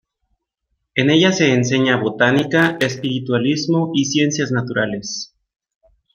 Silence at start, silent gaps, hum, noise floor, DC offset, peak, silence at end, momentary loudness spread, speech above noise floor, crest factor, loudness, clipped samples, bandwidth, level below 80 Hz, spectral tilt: 0.95 s; none; none; -73 dBFS; under 0.1%; -2 dBFS; 0.9 s; 10 LU; 57 dB; 16 dB; -17 LUFS; under 0.1%; 15.5 kHz; -58 dBFS; -4.5 dB/octave